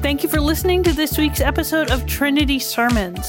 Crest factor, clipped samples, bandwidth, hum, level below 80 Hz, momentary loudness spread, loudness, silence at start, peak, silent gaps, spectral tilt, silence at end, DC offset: 14 dB; under 0.1%; 17 kHz; none; -26 dBFS; 2 LU; -18 LUFS; 0 s; -4 dBFS; none; -4.5 dB/octave; 0 s; under 0.1%